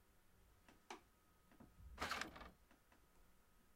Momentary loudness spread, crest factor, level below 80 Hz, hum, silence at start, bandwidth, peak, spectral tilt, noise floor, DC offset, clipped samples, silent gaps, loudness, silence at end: 20 LU; 26 dB; -70 dBFS; none; 0 s; 16 kHz; -30 dBFS; -2.5 dB/octave; -74 dBFS; under 0.1%; under 0.1%; none; -51 LUFS; 0 s